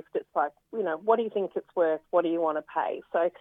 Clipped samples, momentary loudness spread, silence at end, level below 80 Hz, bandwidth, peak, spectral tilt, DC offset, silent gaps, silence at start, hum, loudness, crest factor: under 0.1%; 6 LU; 0.1 s; -78 dBFS; 3.9 kHz; -10 dBFS; -8 dB/octave; under 0.1%; none; 0.15 s; none; -28 LUFS; 18 dB